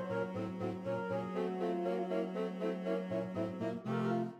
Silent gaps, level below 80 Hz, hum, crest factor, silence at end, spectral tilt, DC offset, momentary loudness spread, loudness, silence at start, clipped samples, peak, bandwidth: none; -80 dBFS; none; 14 dB; 0 s; -8 dB/octave; under 0.1%; 4 LU; -38 LUFS; 0 s; under 0.1%; -22 dBFS; 9.4 kHz